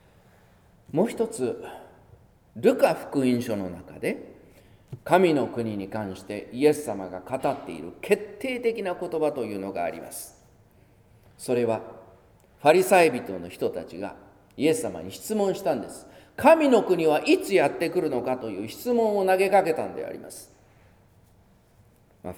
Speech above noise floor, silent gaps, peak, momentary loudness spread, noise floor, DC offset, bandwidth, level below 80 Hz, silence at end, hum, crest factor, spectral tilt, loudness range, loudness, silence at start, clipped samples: 34 dB; none; -4 dBFS; 18 LU; -58 dBFS; under 0.1%; 19.5 kHz; -62 dBFS; 0 s; none; 22 dB; -5 dB/octave; 7 LU; -25 LUFS; 0.9 s; under 0.1%